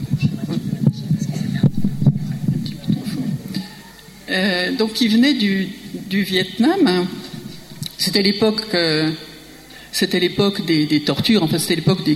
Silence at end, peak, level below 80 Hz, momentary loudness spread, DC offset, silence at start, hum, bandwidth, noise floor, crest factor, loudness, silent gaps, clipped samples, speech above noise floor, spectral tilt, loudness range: 0 s; -2 dBFS; -48 dBFS; 16 LU; under 0.1%; 0 s; none; 16 kHz; -40 dBFS; 16 dB; -19 LUFS; none; under 0.1%; 23 dB; -5.5 dB/octave; 3 LU